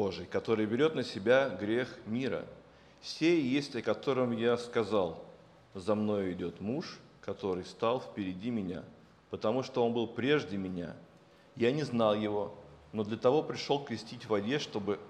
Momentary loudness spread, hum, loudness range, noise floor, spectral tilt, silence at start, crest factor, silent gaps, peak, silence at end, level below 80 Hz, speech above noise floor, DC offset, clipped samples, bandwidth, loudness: 13 LU; none; 4 LU; -56 dBFS; -6 dB/octave; 0 s; 20 dB; none; -14 dBFS; 0 s; -72 dBFS; 24 dB; under 0.1%; under 0.1%; 10 kHz; -33 LUFS